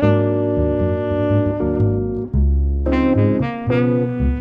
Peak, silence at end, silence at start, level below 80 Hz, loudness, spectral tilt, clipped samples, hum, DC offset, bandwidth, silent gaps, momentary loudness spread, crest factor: -4 dBFS; 0 s; 0 s; -24 dBFS; -18 LUFS; -10.5 dB/octave; under 0.1%; none; under 0.1%; 5 kHz; none; 4 LU; 12 dB